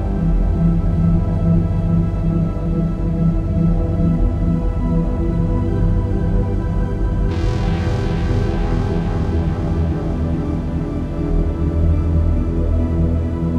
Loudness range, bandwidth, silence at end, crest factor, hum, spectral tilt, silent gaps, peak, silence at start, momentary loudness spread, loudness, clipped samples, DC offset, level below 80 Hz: 2 LU; 6.8 kHz; 0 s; 12 dB; none; -9.5 dB/octave; none; -4 dBFS; 0 s; 4 LU; -19 LUFS; under 0.1%; under 0.1%; -20 dBFS